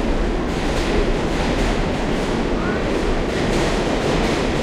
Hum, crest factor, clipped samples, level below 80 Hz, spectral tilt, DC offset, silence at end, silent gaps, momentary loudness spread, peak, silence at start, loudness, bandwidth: none; 14 dB; under 0.1%; -24 dBFS; -5.5 dB/octave; under 0.1%; 0 s; none; 2 LU; -6 dBFS; 0 s; -21 LUFS; 13 kHz